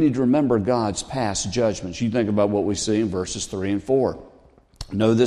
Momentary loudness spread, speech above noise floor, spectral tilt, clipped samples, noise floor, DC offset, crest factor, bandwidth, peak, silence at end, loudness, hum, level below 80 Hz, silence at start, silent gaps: 7 LU; 32 dB; -5.5 dB/octave; under 0.1%; -53 dBFS; under 0.1%; 16 dB; 11.5 kHz; -6 dBFS; 0 s; -22 LUFS; none; -48 dBFS; 0 s; none